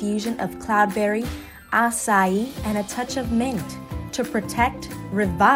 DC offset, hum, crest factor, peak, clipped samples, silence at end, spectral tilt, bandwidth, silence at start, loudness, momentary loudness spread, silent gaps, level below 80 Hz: under 0.1%; none; 18 dB; -4 dBFS; under 0.1%; 0 s; -4.5 dB/octave; 16 kHz; 0 s; -23 LUFS; 11 LU; none; -42 dBFS